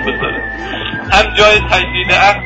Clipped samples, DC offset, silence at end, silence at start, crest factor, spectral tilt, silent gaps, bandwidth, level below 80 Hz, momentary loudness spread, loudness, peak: 0.1%; under 0.1%; 0 s; 0 s; 12 dB; -3.5 dB/octave; none; 11 kHz; -26 dBFS; 12 LU; -11 LUFS; 0 dBFS